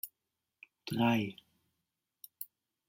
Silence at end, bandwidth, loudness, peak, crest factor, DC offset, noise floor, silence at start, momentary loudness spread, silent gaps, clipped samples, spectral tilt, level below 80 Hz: 0.45 s; 16.5 kHz; -33 LUFS; -18 dBFS; 20 dB; under 0.1%; -88 dBFS; 0.05 s; 25 LU; none; under 0.1%; -6 dB/octave; -78 dBFS